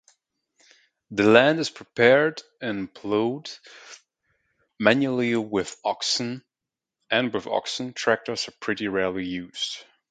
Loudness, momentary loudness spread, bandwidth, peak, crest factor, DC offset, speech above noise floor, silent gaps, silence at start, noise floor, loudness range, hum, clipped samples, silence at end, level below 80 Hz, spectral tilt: -24 LUFS; 15 LU; 9.4 kHz; 0 dBFS; 26 dB; under 0.1%; 65 dB; none; 1.1 s; -89 dBFS; 5 LU; none; under 0.1%; 0.3 s; -64 dBFS; -4 dB/octave